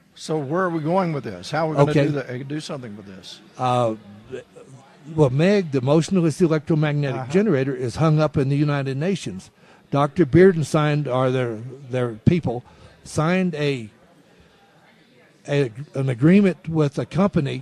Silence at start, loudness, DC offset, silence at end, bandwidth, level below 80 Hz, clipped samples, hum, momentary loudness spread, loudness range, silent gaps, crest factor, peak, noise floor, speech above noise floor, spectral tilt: 0.15 s; -21 LUFS; under 0.1%; 0 s; 11.5 kHz; -50 dBFS; under 0.1%; none; 16 LU; 6 LU; none; 20 dB; 0 dBFS; -54 dBFS; 33 dB; -7.5 dB/octave